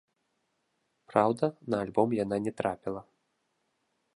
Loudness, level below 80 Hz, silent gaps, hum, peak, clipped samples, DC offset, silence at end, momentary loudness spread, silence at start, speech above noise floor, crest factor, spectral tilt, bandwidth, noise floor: -30 LUFS; -68 dBFS; none; none; -8 dBFS; under 0.1%; under 0.1%; 1.15 s; 10 LU; 1.1 s; 49 dB; 24 dB; -7.5 dB/octave; 11.5 kHz; -78 dBFS